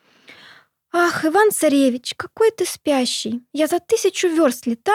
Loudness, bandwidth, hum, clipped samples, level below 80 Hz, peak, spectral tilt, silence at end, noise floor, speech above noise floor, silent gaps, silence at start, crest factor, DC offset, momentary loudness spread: -19 LUFS; 17.5 kHz; none; under 0.1%; -70 dBFS; -4 dBFS; -2.5 dB/octave; 0 s; -49 dBFS; 31 dB; none; 0.3 s; 14 dB; under 0.1%; 8 LU